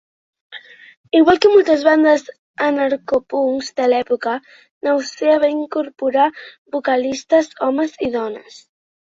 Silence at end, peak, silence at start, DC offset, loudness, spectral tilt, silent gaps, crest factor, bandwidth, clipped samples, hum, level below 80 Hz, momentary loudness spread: 0.75 s; -2 dBFS; 0.5 s; under 0.1%; -17 LUFS; -4 dB/octave; 0.97-1.04 s, 2.39-2.54 s, 4.71-4.81 s, 6.58-6.66 s; 16 dB; 7.8 kHz; under 0.1%; none; -58 dBFS; 15 LU